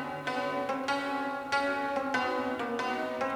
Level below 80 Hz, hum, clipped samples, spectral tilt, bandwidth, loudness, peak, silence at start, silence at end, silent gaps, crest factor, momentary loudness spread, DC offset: -66 dBFS; none; under 0.1%; -4 dB/octave; 20 kHz; -32 LUFS; -14 dBFS; 0 s; 0 s; none; 18 dB; 3 LU; under 0.1%